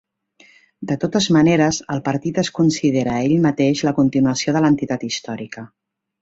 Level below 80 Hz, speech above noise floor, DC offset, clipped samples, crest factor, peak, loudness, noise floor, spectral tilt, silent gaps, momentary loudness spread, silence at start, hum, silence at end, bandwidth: -54 dBFS; 35 dB; under 0.1%; under 0.1%; 16 dB; -4 dBFS; -18 LUFS; -53 dBFS; -5.5 dB/octave; none; 11 LU; 0.8 s; none; 0.55 s; 8 kHz